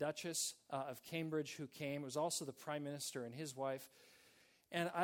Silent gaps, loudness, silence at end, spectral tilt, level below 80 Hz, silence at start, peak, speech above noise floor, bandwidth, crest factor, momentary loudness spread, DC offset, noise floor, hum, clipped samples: none; -44 LUFS; 0 s; -3.5 dB/octave; -88 dBFS; 0 s; -24 dBFS; 27 dB; 18 kHz; 20 dB; 7 LU; under 0.1%; -71 dBFS; none; under 0.1%